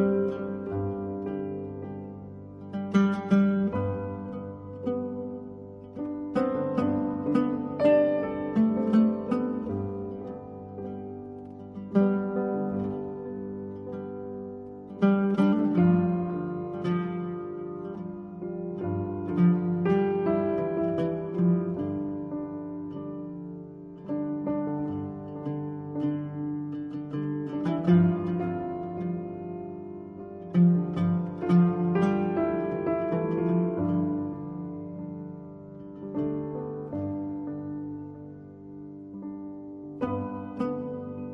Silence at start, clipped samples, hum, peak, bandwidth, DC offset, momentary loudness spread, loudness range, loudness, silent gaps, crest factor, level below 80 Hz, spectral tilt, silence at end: 0 s; under 0.1%; none; -10 dBFS; 6 kHz; under 0.1%; 17 LU; 9 LU; -29 LUFS; none; 18 dB; -60 dBFS; -10 dB/octave; 0 s